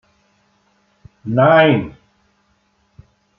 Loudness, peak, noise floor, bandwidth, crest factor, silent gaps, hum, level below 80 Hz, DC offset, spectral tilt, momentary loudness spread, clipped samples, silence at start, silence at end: -13 LUFS; -2 dBFS; -62 dBFS; 5.6 kHz; 18 dB; none; none; -56 dBFS; under 0.1%; -9 dB/octave; 22 LU; under 0.1%; 1.25 s; 1.5 s